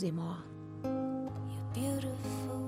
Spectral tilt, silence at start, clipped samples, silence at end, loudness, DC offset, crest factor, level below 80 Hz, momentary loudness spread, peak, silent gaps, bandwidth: -7 dB/octave; 0 s; under 0.1%; 0 s; -38 LUFS; under 0.1%; 14 dB; -62 dBFS; 6 LU; -24 dBFS; none; 16 kHz